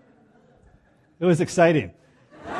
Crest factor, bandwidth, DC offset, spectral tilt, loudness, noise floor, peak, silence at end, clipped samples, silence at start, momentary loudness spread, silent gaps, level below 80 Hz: 20 dB; 12 kHz; under 0.1%; -6.5 dB/octave; -21 LUFS; -58 dBFS; -6 dBFS; 0 s; under 0.1%; 1.2 s; 19 LU; none; -62 dBFS